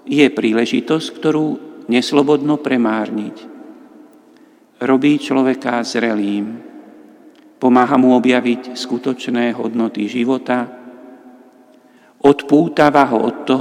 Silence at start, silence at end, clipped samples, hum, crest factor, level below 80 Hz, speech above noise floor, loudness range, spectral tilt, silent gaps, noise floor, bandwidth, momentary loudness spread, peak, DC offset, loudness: 0.05 s; 0 s; under 0.1%; none; 16 dB; -64 dBFS; 33 dB; 4 LU; -5.5 dB/octave; none; -48 dBFS; 11 kHz; 11 LU; 0 dBFS; under 0.1%; -16 LUFS